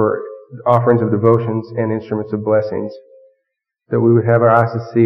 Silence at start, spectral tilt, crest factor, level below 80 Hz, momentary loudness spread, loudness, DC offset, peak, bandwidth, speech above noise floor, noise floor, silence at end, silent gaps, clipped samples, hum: 0 s; -10.5 dB/octave; 14 dB; -60 dBFS; 11 LU; -16 LUFS; under 0.1%; 0 dBFS; 5.8 kHz; 60 dB; -75 dBFS; 0 s; none; under 0.1%; none